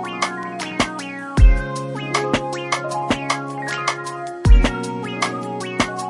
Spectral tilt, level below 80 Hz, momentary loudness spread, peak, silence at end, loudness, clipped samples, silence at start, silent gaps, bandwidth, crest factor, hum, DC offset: -5 dB/octave; -22 dBFS; 10 LU; -2 dBFS; 0 s; -21 LUFS; under 0.1%; 0 s; none; 11.5 kHz; 18 dB; none; under 0.1%